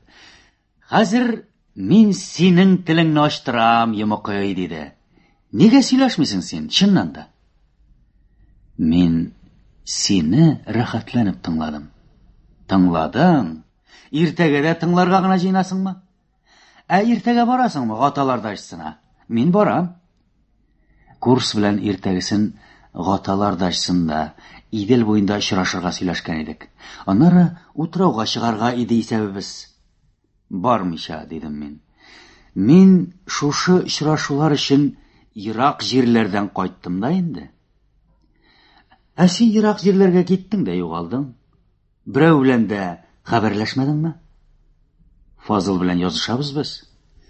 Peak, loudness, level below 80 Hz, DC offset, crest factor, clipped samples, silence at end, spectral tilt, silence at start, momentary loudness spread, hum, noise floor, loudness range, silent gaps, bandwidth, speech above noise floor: 0 dBFS; -18 LUFS; -48 dBFS; under 0.1%; 18 dB; under 0.1%; 0.5 s; -6 dB/octave; 0.9 s; 16 LU; none; -62 dBFS; 6 LU; none; 8.4 kHz; 45 dB